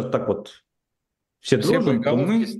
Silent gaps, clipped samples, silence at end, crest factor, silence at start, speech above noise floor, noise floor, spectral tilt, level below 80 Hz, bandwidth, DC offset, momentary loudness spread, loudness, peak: none; under 0.1%; 0 s; 20 dB; 0 s; 60 dB; -81 dBFS; -6.5 dB/octave; -60 dBFS; 12.5 kHz; under 0.1%; 9 LU; -21 LUFS; -2 dBFS